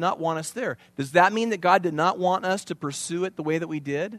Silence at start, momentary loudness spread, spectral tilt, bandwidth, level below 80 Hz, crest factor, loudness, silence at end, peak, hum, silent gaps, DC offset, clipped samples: 0 s; 10 LU; -4.5 dB/octave; 13.5 kHz; -72 dBFS; 22 dB; -25 LUFS; 0 s; -2 dBFS; none; none; under 0.1%; under 0.1%